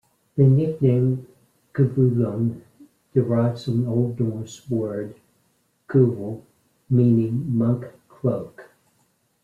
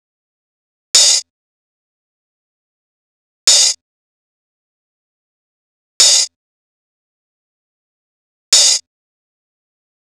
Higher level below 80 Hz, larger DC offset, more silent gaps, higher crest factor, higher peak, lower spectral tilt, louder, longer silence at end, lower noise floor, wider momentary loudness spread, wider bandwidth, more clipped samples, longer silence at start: first, -60 dBFS vs -76 dBFS; neither; second, none vs 1.30-3.47 s, 3.81-6.00 s, 6.36-8.52 s; about the same, 18 dB vs 20 dB; second, -6 dBFS vs 0 dBFS; first, -10 dB/octave vs 5 dB/octave; second, -22 LUFS vs -10 LUFS; second, 0.8 s vs 1.3 s; second, -66 dBFS vs under -90 dBFS; first, 15 LU vs 8 LU; second, 7.4 kHz vs over 20 kHz; neither; second, 0.35 s vs 0.95 s